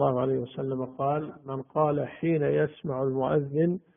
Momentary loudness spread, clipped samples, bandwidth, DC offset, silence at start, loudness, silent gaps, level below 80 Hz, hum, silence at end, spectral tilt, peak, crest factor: 7 LU; under 0.1%; 3.7 kHz; under 0.1%; 0 s; -28 LUFS; none; -64 dBFS; none; 0.2 s; -8 dB/octave; -12 dBFS; 16 dB